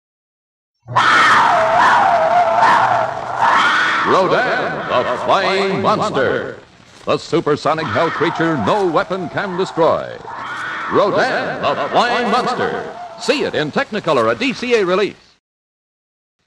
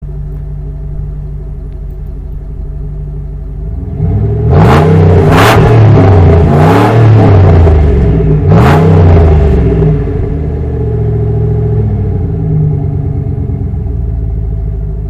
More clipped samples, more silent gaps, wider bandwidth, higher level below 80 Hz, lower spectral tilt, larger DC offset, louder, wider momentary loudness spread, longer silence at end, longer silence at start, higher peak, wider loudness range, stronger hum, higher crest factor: second, under 0.1% vs 1%; neither; second, 12 kHz vs 14.5 kHz; second, -54 dBFS vs -16 dBFS; second, -4.5 dB/octave vs -8.5 dB/octave; neither; second, -15 LUFS vs -8 LUFS; second, 10 LU vs 17 LU; first, 1.35 s vs 0 s; first, 0.9 s vs 0 s; about the same, -2 dBFS vs 0 dBFS; second, 5 LU vs 14 LU; neither; first, 14 dB vs 8 dB